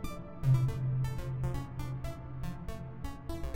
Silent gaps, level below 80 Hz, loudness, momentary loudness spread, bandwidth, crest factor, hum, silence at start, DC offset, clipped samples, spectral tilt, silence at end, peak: none; -44 dBFS; -36 LUFS; 14 LU; 16 kHz; 18 dB; none; 0 s; under 0.1%; under 0.1%; -7.5 dB/octave; 0 s; -16 dBFS